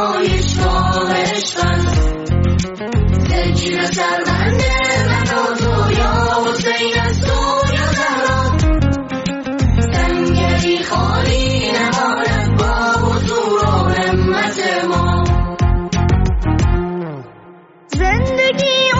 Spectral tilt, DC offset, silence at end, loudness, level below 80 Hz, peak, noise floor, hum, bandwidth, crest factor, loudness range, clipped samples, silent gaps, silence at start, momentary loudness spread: -5 dB/octave; under 0.1%; 0 s; -15 LUFS; -24 dBFS; -4 dBFS; -41 dBFS; none; 8 kHz; 12 dB; 1 LU; under 0.1%; none; 0 s; 3 LU